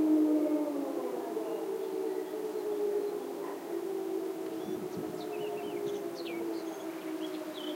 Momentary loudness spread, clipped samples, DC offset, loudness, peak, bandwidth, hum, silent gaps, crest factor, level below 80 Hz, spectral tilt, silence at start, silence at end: 8 LU; under 0.1%; under 0.1%; -35 LUFS; -18 dBFS; 16 kHz; none; none; 16 dB; -84 dBFS; -5.5 dB/octave; 0 s; 0 s